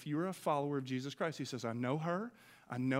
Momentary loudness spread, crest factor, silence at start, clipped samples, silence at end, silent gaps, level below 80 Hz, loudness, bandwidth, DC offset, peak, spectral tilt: 5 LU; 18 dB; 0 s; under 0.1%; 0 s; none; -82 dBFS; -39 LUFS; 16 kHz; under 0.1%; -20 dBFS; -6.5 dB/octave